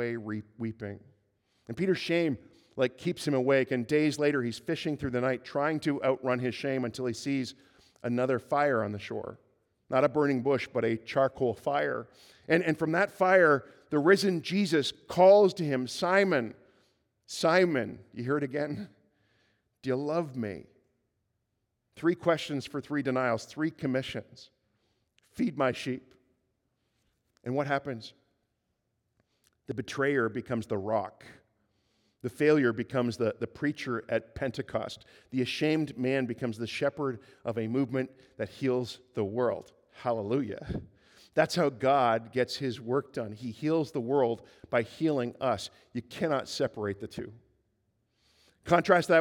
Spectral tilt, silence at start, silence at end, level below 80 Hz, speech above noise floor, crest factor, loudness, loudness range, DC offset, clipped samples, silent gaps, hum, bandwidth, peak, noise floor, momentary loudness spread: -6 dB/octave; 0 s; 0 s; -66 dBFS; 51 dB; 22 dB; -30 LUFS; 9 LU; under 0.1%; under 0.1%; none; none; 17.5 kHz; -8 dBFS; -80 dBFS; 15 LU